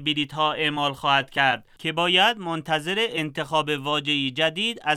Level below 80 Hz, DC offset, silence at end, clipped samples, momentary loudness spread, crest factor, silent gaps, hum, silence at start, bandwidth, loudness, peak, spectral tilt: -62 dBFS; under 0.1%; 0 s; under 0.1%; 7 LU; 18 dB; none; none; 0 s; 15 kHz; -23 LUFS; -4 dBFS; -4 dB/octave